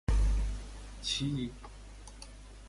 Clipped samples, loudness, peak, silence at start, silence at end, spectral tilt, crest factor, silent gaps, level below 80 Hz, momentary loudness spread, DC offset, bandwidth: under 0.1%; -35 LUFS; -18 dBFS; 0.1 s; 0 s; -4.5 dB/octave; 16 dB; none; -36 dBFS; 19 LU; under 0.1%; 11.5 kHz